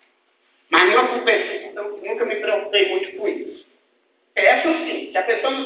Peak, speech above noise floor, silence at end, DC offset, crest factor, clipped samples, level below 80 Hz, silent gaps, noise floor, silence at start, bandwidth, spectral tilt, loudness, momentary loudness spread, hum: 0 dBFS; 44 dB; 0 s; under 0.1%; 20 dB; under 0.1%; -72 dBFS; none; -64 dBFS; 0.7 s; 4 kHz; -5.5 dB/octave; -19 LUFS; 13 LU; none